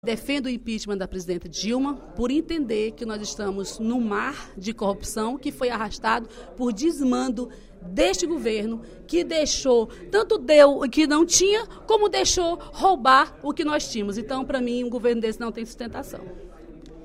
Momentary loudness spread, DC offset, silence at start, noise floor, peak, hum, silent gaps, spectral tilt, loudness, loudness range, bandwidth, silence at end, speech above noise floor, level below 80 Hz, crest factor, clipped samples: 14 LU; under 0.1%; 0.05 s; -43 dBFS; -2 dBFS; none; none; -3 dB/octave; -23 LUFS; 8 LU; 16 kHz; 0 s; 20 dB; -44 dBFS; 22 dB; under 0.1%